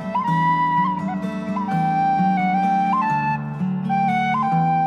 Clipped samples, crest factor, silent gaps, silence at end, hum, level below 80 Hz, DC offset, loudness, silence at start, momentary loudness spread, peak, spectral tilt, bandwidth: under 0.1%; 12 dB; none; 0 s; none; -56 dBFS; under 0.1%; -20 LUFS; 0 s; 6 LU; -8 dBFS; -8 dB/octave; 9.2 kHz